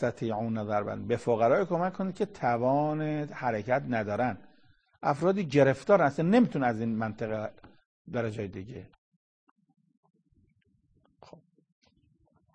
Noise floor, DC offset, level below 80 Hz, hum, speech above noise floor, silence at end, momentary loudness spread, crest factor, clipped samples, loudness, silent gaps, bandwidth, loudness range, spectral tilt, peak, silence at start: -70 dBFS; under 0.1%; -64 dBFS; none; 42 dB; 3.7 s; 12 LU; 22 dB; under 0.1%; -29 LUFS; 7.86-8.05 s; 9.6 kHz; 14 LU; -7.5 dB/octave; -8 dBFS; 0 s